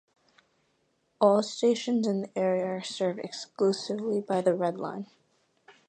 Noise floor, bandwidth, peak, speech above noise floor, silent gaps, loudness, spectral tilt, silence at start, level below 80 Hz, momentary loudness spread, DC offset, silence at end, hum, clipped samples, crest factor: -73 dBFS; 9.6 kHz; -10 dBFS; 45 dB; none; -28 LUFS; -5.5 dB/octave; 1.2 s; -80 dBFS; 13 LU; under 0.1%; 0.2 s; none; under 0.1%; 20 dB